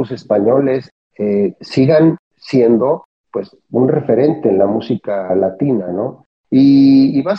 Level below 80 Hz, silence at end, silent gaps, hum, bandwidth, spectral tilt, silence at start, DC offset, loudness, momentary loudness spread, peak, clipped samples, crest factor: -58 dBFS; 0 s; 0.91-1.10 s, 2.19-2.31 s, 3.05-3.24 s, 6.26-6.44 s; none; 6.2 kHz; -9 dB/octave; 0 s; under 0.1%; -14 LUFS; 12 LU; -2 dBFS; under 0.1%; 12 dB